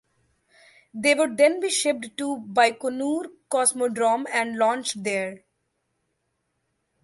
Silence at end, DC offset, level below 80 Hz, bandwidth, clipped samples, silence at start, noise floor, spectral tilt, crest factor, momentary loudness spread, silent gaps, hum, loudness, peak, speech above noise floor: 1.65 s; under 0.1%; -74 dBFS; 12 kHz; under 0.1%; 0.95 s; -76 dBFS; -2 dB/octave; 20 dB; 9 LU; none; none; -23 LUFS; -6 dBFS; 52 dB